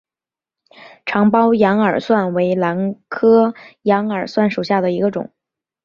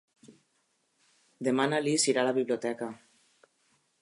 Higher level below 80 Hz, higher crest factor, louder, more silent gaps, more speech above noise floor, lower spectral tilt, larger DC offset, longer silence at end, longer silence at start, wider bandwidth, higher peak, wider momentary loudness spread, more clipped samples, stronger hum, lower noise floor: first, -60 dBFS vs -84 dBFS; about the same, 16 dB vs 20 dB; first, -16 LUFS vs -29 LUFS; neither; first, over 74 dB vs 46 dB; first, -8 dB/octave vs -3.5 dB/octave; neither; second, 0.6 s vs 1.05 s; first, 1.05 s vs 0.3 s; second, 7 kHz vs 11.5 kHz; first, -2 dBFS vs -12 dBFS; second, 10 LU vs 13 LU; neither; neither; first, under -90 dBFS vs -74 dBFS